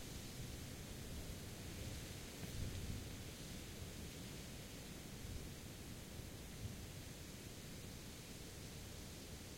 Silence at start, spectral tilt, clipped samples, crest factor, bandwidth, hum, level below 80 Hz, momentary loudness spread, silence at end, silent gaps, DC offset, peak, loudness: 0 s; -4 dB/octave; under 0.1%; 18 dB; 16.5 kHz; none; -58 dBFS; 4 LU; 0 s; none; under 0.1%; -32 dBFS; -51 LUFS